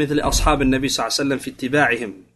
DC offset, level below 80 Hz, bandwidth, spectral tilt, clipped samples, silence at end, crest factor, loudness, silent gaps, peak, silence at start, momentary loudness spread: under 0.1%; -30 dBFS; 12.5 kHz; -4 dB/octave; under 0.1%; 0.15 s; 18 dB; -19 LUFS; none; -2 dBFS; 0 s; 6 LU